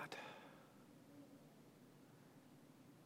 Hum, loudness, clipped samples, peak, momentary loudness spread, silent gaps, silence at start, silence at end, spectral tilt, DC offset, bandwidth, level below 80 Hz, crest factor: none; -61 LUFS; under 0.1%; -32 dBFS; 11 LU; none; 0 s; 0 s; -4.5 dB/octave; under 0.1%; 16.5 kHz; under -90 dBFS; 28 dB